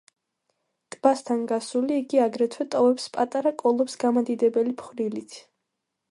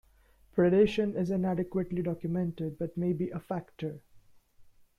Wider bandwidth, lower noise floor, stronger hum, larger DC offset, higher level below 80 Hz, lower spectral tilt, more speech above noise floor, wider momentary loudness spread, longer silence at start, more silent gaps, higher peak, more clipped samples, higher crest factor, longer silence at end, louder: first, 11.5 kHz vs 7.2 kHz; first, -81 dBFS vs -62 dBFS; neither; neither; second, -78 dBFS vs -58 dBFS; second, -5 dB/octave vs -8.5 dB/octave; first, 57 dB vs 33 dB; second, 8 LU vs 14 LU; first, 1.05 s vs 0.55 s; neither; first, -6 dBFS vs -12 dBFS; neither; about the same, 20 dB vs 18 dB; first, 0.7 s vs 0.35 s; first, -24 LUFS vs -31 LUFS